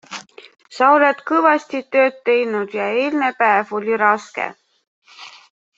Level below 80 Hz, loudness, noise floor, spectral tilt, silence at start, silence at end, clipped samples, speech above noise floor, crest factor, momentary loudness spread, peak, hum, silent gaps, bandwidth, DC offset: -70 dBFS; -17 LUFS; -36 dBFS; -4.5 dB/octave; 0.1 s; 0.5 s; under 0.1%; 19 dB; 18 dB; 17 LU; -2 dBFS; none; 4.87-5.02 s; 8 kHz; under 0.1%